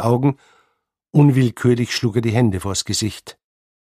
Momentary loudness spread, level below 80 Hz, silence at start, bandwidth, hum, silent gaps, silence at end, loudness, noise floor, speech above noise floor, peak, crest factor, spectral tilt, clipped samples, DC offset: 9 LU; -50 dBFS; 0 s; 15 kHz; none; none; 0.55 s; -18 LUFS; -69 dBFS; 52 dB; -2 dBFS; 16 dB; -6 dB/octave; under 0.1%; under 0.1%